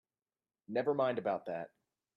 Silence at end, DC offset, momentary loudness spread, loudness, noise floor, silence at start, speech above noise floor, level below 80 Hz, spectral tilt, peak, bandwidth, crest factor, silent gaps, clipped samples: 0.5 s; under 0.1%; 11 LU; -36 LUFS; under -90 dBFS; 0.7 s; over 55 dB; -82 dBFS; -8.5 dB/octave; -22 dBFS; 5.8 kHz; 16 dB; none; under 0.1%